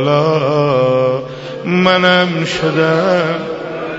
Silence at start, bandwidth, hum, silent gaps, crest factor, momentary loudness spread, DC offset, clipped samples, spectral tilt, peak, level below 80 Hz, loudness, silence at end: 0 s; 8 kHz; none; none; 14 dB; 12 LU; under 0.1%; under 0.1%; -6 dB/octave; 0 dBFS; -50 dBFS; -14 LUFS; 0 s